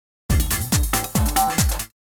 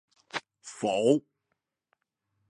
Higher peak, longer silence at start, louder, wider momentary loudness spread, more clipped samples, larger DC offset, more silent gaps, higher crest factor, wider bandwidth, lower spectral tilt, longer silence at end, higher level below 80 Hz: first, -6 dBFS vs -10 dBFS; about the same, 0.3 s vs 0.35 s; first, -21 LUFS vs -29 LUFS; second, 4 LU vs 13 LU; neither; neither; neither; second, 16 dB vs 22 dB; first, over 20 kHz vs 11 kHz; second, -3.5 dB/octave vs -5 dB/octave; second, 0.25 s vs 1.3 s; first, -26 dBFS vs -80 dBFS